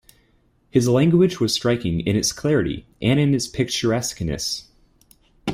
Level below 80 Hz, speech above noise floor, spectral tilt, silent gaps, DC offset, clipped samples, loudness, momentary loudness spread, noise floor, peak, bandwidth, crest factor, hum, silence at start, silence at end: -46 dBFS; 41 dB; -5 dB/octave; none; under 0.1%; under 0.1%; -21 LUFS; 9 LU; -61 dBFS; -4 dBFS; 16 kHz; 16 dB; none; 0.75 s; 0 s